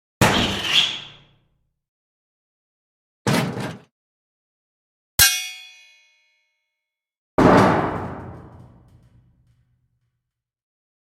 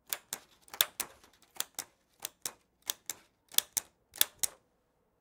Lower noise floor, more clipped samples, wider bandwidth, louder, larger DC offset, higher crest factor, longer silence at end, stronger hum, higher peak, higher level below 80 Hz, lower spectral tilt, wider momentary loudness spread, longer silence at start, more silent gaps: first, -84 dBFS vs -75 dBFS; neither; about the same, 16.5 kHz vs 18 kHz; first, -18 LUFS vs -35 LUFS; neither; second, 24 dB vs 36 dB; first, 2.65 s vs 0.7 s; neither; about the same, 0 dBFS vs -2 dBFS; first, -46 dBFS vs -76 dBFS; first, -3.5 dB/octave vs 2 dB/octave; first, 19 LU vs 14 LU; about the same, 0.2 s vs 0.1 s; first, 1.88-3.25 s, 3.91-5.18 s, 7.18-7.38 s vs none